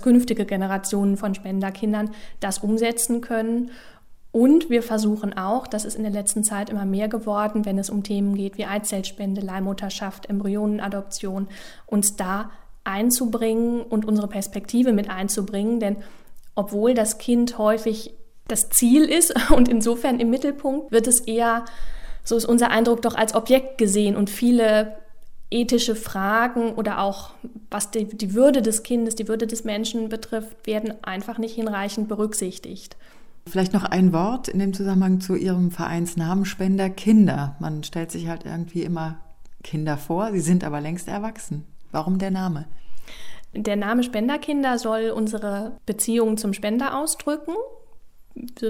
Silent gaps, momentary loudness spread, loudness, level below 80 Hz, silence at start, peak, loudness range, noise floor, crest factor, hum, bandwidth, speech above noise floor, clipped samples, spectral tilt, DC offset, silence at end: none; 13 LU; -22 LUFS; -44 dBFS; 0 s; 0 dBFS; 7 LU; -43 dBFS; 22 dB; none; 16.5 kHz; 22 dB; under 0.1%; -4.5 dB/octave; under 0.1%; 0 s